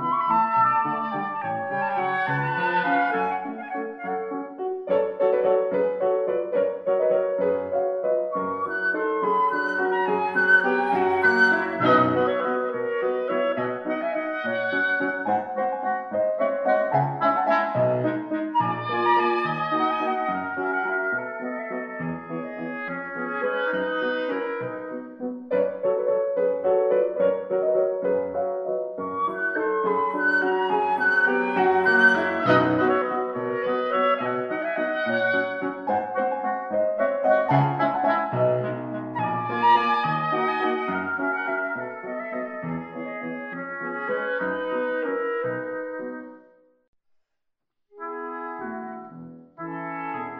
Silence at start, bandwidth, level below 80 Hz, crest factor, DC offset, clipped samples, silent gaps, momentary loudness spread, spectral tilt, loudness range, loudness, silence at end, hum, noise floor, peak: 0 s; 6.4 kHz; -74 dBFS; 18 dB; under 0.1%; under 0.1%; 46.88-46.93 s; 12 LU; -7.5 dB/octave; 8 LU; -24 LUFS; 0 s; none; -77 dBFS; -6 dBFS